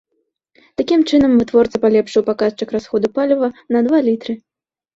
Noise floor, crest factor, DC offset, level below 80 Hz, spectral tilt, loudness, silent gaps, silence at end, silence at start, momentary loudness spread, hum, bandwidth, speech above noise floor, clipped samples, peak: -70 dBFS; 14 dB; under 0.1%; -50 dBFS; -6 dB/octave; -16 LUFS; none; 0.6 s; 0.8 s; 11 LU; none; 7.8 kHz; 55 dB; under 0.1%; -2 dBFS